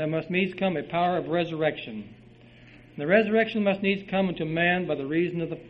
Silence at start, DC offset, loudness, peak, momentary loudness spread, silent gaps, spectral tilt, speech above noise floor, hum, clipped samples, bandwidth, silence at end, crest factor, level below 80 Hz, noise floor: 0 s; under 0.1%; -26 LUFS; -8 dBFS; 8 LU; none; -8.5 dB/octave; 25 dB; none; under 0.1%; 5.8 kHz; 0 s; 20 dB; -60 dBFS; -51 dBFS